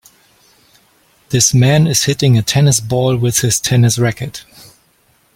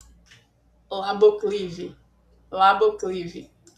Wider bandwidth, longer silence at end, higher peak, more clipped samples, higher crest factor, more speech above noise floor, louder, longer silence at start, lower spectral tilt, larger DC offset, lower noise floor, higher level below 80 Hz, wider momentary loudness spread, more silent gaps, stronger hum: first, 16.5 kHz vs 9 kHz; first, 0.95 s vs 0.35 s; first, 0 dBFS vs -6 dBFS; neither; about the same, 14 dB vs 18 dB; first, 43 dB vs 39 dB; first, -12 LUFS vs -22 LUFS; first, 1.3 s vs 0.9 s; about the same, -4.5 dB/octave vs -5 dB/octave; neither; second, -55 dBFS vs -60 dBFS; first, -44 dBFS vs -58 dBFS; second, 9 LU vs 19 LU; neither; neither